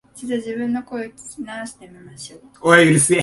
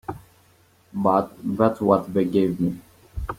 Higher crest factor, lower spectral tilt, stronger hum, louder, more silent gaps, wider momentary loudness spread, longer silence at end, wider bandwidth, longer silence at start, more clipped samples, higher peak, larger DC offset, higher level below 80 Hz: about the same, 18 dB vs 20 dB; second, -4 dB/octave vs -8.5 dB/octave; neither; first, -17 LUFS vs -22 LUFS; neither; first, 24 LU vs 18 LU; about the same, 0 s vs 0 s; second, 11.5 kHz vs 16 kHz; about the same, 0.15 s vs 0.1 s; neither; about the same, 0 dBFS vs -2 dBFS; neither; second, -58 dBFS vs -44 dBFS